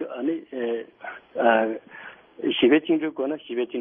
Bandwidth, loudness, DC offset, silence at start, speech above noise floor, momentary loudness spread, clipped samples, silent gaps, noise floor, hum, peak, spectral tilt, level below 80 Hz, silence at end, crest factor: 3.7 kHz; -24 LUFS; under 0.1%; 0 s; 21 dB; 20 LU; under 0.1%; none; -44 dBFS; none; -6 dBFS; -9 dB/octave; -70 dBFS; 0 s; 18 dB